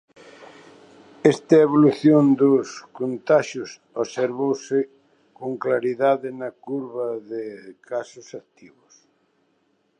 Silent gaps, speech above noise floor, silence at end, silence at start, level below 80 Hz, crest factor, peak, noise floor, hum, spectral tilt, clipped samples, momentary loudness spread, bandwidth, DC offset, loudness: none; 46 dB; 1.6 s; 0.4 s; -74 dBFS; 20 dB; -2 dBFS; -67 dBFS; none; -7 dB/octave; under 0.1%; 18 LU; 9.6 kHz; under 0.1%; -21 LUFS